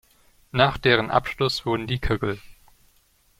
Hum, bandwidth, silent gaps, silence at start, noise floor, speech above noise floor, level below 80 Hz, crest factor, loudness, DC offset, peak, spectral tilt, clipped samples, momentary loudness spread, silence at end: none; 16 kHz; none; 0.55 s; -61 dBFS; 39 dB; -40 dBFS; 22 dB; -23 LUFS; under 0.1%; -2 dBFS; -5.5 dB/octave; under 0.1%; 10 LU; 0.9 s